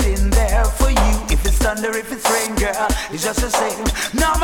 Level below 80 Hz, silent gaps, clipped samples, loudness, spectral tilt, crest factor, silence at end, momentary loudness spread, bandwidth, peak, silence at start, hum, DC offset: -20 dBFS; none; under 0.1%; -19 LUFS; -4 dB/octave; 16 dB; 0 s; 4 LU; 18.5 kHz; -2 dBFS; 0 s; none; under 0.1%